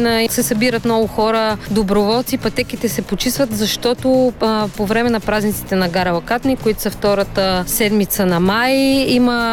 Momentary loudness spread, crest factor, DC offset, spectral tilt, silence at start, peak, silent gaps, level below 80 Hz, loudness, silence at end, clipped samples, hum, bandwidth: 5 LU; 12 dB; under 0.1%; -4.5 dB/octave; 0 s; -4 dBFS; none; -36 dBFS; -16 LUFS; 0 s; under 0.1%; none; 19.5 kHz